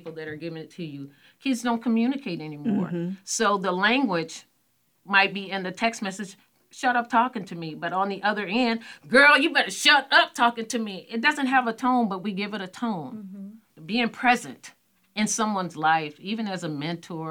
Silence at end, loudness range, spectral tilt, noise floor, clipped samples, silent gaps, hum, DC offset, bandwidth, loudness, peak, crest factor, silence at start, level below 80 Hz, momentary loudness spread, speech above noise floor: 0 s; 7 LU; -3.5 dB/octave; -69 dBFS; under 0.1%; none; none; under 0.1%; 19 kHz; -24 LUFS; -4 dBFS; 22 dB; 0.05 s; -72 dBFS; 18 LU; 44 dB